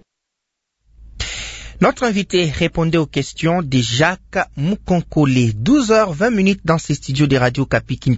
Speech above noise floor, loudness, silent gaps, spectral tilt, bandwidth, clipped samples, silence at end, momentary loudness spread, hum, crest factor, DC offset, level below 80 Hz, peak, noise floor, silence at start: 62 dB; -17 LUFS; none; -5.5 dB/octave; 8 kHz; under 0.1%; 0 s; 7 LU; none; 16 dB; under 0.1%; -38 dBFS; -2 dBFS; -79 dBFS; 1 s